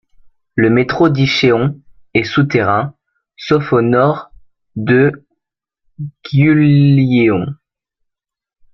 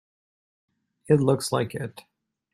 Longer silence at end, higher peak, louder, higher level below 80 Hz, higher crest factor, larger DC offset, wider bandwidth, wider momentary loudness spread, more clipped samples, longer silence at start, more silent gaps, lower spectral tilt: first, 1.2 s vs 0.55 s; first, -2 dBFS vs -6 dBFS; first, -13 LUFS vs -24 LUFS; first, -48 dBFS vs -64 dBFS; second, 14 dB vs 22 dB; neither; second, 6.6 kHz vs 14.5 kHz; about the same, 16 LU vs 14 LU; neither; second, 0.55 s vs 1.1 s; neither; first, -8 dB/octave vs -6 dB/octave